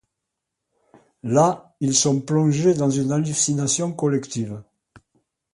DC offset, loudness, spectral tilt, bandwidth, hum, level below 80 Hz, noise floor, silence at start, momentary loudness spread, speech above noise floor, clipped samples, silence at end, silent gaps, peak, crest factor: under 0.1%; -21 LUFS; -5 dB/octave; 11.5 kHz; none; -62 dBFS; -81 dBFS; 1.25 s; 11 LU; 61 dB; under 0.1%; 0.9 s; none; -4 dBFS; 18 dB